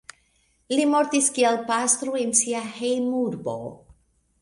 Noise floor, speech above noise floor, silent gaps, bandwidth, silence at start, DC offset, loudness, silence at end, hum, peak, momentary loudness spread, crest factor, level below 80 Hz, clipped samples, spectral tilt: -66 dBFS; 42 dB; none; 11.5 kHz; 0.7 s; under 0.1%; -22 LUFS; 0.5 s; none; -4 dBFS; 10 LU; 20 dB; -66 dBFS; under 0.1%; -2.5 dB/octave